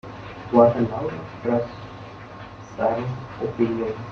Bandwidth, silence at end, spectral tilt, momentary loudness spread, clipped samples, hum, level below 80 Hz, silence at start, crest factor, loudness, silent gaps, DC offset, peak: 6.8 kHz; 0 s; -8.5 dB/octave; 22 LU; under 0.1%; none; -52 dBFS; 0.05 s; 20 dB; -23 LUFS; none; under 0.1%; -4 dBFS